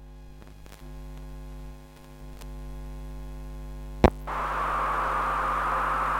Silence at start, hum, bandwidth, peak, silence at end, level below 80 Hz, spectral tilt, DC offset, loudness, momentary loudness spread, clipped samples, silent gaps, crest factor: 0 s; none; 16.5 kHz; -2 dBFS; 0 s; -38 dBFS; -6.5 dB/octave; under 0.1%; -26 LUFS; 24 LU; under 0.1%; none; 28 dB